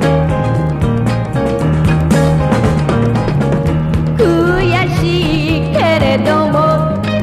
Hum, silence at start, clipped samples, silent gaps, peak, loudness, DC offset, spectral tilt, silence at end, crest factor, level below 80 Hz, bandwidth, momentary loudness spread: none; 0 s; under 0.1%; none; 0 dBFS; -13 LUFS; under 0.1%; -7 dB/octave; 0 s; 12 dB; -26 dBFS; 13.5 kHz; 3 LU